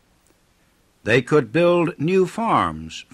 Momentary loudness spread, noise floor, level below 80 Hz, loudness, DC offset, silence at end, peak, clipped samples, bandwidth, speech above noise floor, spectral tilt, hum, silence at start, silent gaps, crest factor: 8 LU; -60 dBFS; -52 dBFS; -19 LUFS; under 0.1%; 0.1 s; -4 dBFS; under 0.1%; 12.5 kHz; 41 dB; -6.5 dB/octave; none; 1.05 s; none; 16 dB